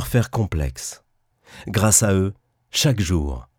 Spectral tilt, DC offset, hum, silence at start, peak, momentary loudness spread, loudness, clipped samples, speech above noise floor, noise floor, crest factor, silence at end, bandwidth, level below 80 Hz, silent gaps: -4 dB/octave; under 0.1%; none; 0 s; -2 dBFS; 14 LU; -20 LUFS; under 0.1%; 35 dB; -55 dBFS; 20 dB; 0.15 s; 19 kHz; -34 dBFS; none